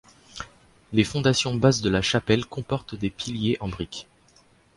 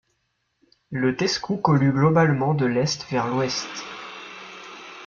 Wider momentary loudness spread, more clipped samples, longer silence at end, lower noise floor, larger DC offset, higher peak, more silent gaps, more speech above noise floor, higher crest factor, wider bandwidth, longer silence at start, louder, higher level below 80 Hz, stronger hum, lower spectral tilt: about the same, 19 LU vs 19 LU; neither; first, 0.75 s vs 0 s; second, -58 dBFS vs -73 dBFS; neither; about the same, -4 dBFS vs -4 dBFS; neither; second, 34 dB vs 51 dB; about the same, 22 dB vs 20 dB; first, 11.5 kHz vs 7.4 kHz; second, 0.35 s vs 0.9 s; about the same, -24 LUFS vs -22 LUFS; first, -48 dBFS vs -58 dBFS; neither; about the same, -5 dB/octave vs -5.5 dB/octave